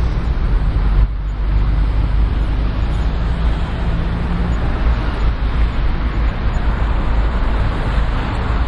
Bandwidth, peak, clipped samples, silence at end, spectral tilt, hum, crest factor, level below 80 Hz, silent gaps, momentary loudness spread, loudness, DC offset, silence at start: 5.4 kHz; -2 dBFS; under 0.1%; 0 s; -8 dB/octave; none; 14 dB; -16 dBFS; none; 2 LU; -19 LUFS; under 0.1%; 0 s